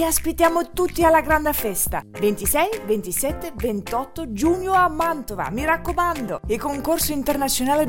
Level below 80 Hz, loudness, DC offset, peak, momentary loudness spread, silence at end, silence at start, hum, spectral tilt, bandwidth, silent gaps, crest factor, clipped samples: -38 dBFS; -21 LUFS; under 0.1%; -4 dBFS; 8 LU; 0 s; 0 s; none; -3.5 dB/octave; 17 kHz; none; 16 dB; under 0.1%